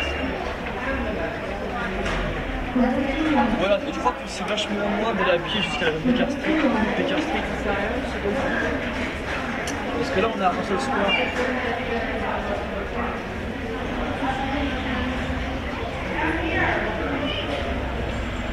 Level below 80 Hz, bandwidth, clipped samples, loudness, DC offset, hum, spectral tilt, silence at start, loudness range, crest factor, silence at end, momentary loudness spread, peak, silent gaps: -36 dBFS; 15 kHz; under 0.1%; -24 LUFS; under 0.1%; none; -5.5 dB/octave; 0 s; 4 LU; 18 dB; 0 s; 7 LU; -6 dBFS; none